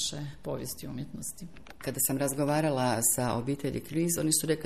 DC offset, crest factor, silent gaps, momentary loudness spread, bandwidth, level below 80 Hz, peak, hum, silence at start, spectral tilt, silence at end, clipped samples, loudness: 0.3%; 18 dB; none; 14 LU; 15 kHz; -56 dBFS; -14 dBFS; none; 0 s; -4 dB/octave; 0 s; under 0.1%; -30 LUFS